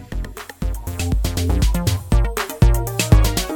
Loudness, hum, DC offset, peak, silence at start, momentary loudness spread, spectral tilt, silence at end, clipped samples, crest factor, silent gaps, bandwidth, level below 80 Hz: -19 LUFS; none; under 0.1%; 0 dBFS; 0 s; 13 LU; -5 dB/octave; 0 s; under 0.1%; 16 dB; none; 18 kHz; -20 dBFS